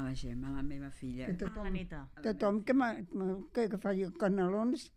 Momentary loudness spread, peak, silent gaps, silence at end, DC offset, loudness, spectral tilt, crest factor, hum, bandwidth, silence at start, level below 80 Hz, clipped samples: 10 LU; -18 dBFS; none; 0.1 s; under 0.1%; -36 LUFS; -7.5 dB/octave; 18 dB; none; 11.5 kHz; 0 s; -50 dBFS; under 0.1%